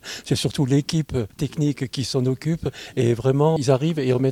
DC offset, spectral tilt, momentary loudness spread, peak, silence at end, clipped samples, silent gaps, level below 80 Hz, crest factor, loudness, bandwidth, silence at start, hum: under 0.1%; -6.5 dB/octave; 7 LU; -4 dBFS; 0 s; under 0.1%; none; -48 dBFS; 16 dB; -22 LUFS; 15.5 kHz; 0.05 s; none